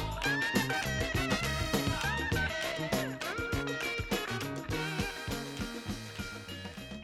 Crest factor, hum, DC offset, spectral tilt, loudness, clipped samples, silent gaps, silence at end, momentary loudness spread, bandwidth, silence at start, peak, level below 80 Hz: 20 dB; none; under 0.1%; -4 dB/octave; -34 LUFS; under 0.1%; none; 0 s; 10 LU; 18.5 kHz; 0 s; -14 dBFS; -46 dBFS